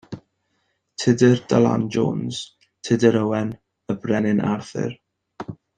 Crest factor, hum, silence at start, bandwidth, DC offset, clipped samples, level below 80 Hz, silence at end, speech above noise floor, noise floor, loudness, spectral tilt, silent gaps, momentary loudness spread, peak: 20 dB; none; 0.1 s; 9.4 kHz; under 0.1%; under 0.1%; -58 dBFS; 0.25 s; 51 dB; -71 dBFS; -21 LUFS; -6.5 dB/octave; none; 21 LU; -2 dBFS